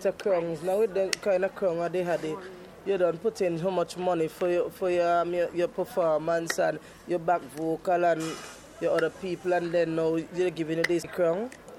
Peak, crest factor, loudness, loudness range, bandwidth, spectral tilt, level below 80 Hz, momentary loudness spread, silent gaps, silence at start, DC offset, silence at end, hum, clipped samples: -4 dBFS; 24 dB; -28 LUFS; 1 LU; 16 kHz; -5 dB/octave; -64 dBFS; 7 LU; none; 0 s; under 0.1%; 0 s; none; under 0.1%